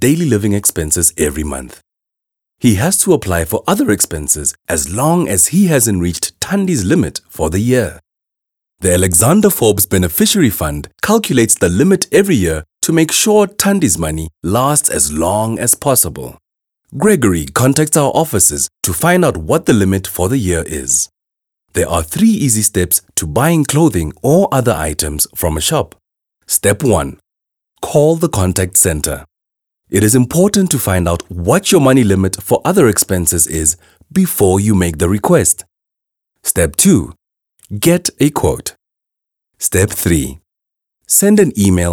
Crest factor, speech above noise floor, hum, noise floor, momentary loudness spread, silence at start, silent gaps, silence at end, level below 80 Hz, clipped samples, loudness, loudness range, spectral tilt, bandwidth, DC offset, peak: 14 dB; 69 dB; none; -82 dBFS; 8 LU; 0 s; none; 0 s; -34 dBFS; under 0.1%; -13 LUFS; 3 LU; -4.5 dB/octave; 19.5 kHz; under 0.1%; 0 dBFS